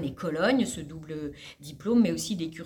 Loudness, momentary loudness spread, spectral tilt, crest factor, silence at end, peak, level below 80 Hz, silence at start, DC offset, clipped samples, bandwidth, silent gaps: -28 LUFS; 15 LU; -5 dB/octave; 16 dB; 0 s; -12 dBFS; -56 dBFS; 0 s; under 0.1%; under 0.1%; 18 kHz; none